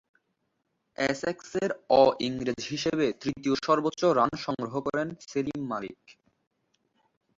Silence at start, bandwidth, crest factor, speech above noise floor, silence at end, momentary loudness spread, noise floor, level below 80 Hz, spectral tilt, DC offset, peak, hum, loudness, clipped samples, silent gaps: 1 s; 7.8 kHz; 22 dB; 50 dB; 1.25 s; 10 LU; -78 dBFS; -64 dBFS; -5 dB/octave; under 0.1%; -6 dBFS; none; -28 LUFS; under 0.1%; none